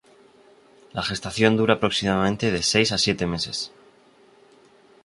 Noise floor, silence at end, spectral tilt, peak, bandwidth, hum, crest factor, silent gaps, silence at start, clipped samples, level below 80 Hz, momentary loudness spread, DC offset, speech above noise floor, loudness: -55 dBFS; 1.35 s; -4 dB/octave; -2 dBFS; 11.5 kHz; none; 22 dB; none; 0.95 s; under 0.1%; -50 dBFS; 10 LU; under 0.1%; 33 dB; -22 LUFS